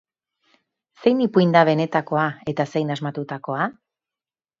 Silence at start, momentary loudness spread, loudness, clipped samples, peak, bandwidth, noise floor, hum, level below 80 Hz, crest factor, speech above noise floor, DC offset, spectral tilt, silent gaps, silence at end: 1 s; 11 LU; -21 LUFS; under 0.1%; 0 dBFS; 7.6 kHz; under -90 dBFS; none; -66 dBFS; 22 dB; over 70 dB; under 0.1%; -7.5 dB/octave; none; 0.9 s